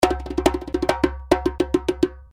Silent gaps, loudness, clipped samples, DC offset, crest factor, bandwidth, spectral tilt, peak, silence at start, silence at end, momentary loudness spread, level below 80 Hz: none; -22 LUFS; under 0.1%; under 0.1%; 20 dB; 17 kHz; -5.5 dB/octave; -2 dBFS; 0 s; 0.05 s; 3 LU; -34 dBFS